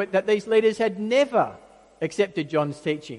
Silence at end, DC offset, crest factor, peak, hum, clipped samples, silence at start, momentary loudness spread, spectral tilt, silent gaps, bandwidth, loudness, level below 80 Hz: 0 s; under 0.1%; 16 dB; -8 dBFS; none; under 0.1%; 0 s; 9 LU; -5.5 dB/octave; none; 11 kHz; -23 LUFS; -66 dBFS